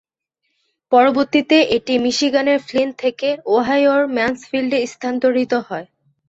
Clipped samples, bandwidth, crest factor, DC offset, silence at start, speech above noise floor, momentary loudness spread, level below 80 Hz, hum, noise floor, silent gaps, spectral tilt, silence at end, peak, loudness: under 0.1%; 8 kHz; 16 dB; under 0.1%; 0.9 s; 57 dB; 8 LU; -58 dBFS; none; -73 dBFS; none; -3.5 dB/octave; 0.45 s; -2 dBFS; -17 LUFS